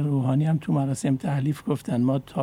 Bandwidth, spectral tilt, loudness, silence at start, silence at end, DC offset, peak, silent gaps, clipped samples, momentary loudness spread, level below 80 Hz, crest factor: 13.5 kHz; -8 dB/octave; -25 LUFS; 0 s; 0 s; under 0.1%; -12 dBFS; none; under 0.1%; 4 LU; -58 dBFS; 12 dB